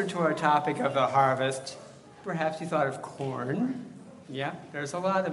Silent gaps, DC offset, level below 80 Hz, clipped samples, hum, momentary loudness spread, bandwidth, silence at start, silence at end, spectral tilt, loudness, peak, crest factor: none; under 0.1%; -74 dBFS; under 0.1%; none; 17 LU; 11.5 kHz; 0 s; 0 s; -5.5 dB/octave; -29 LUFS; -10 dBFS; 20 dB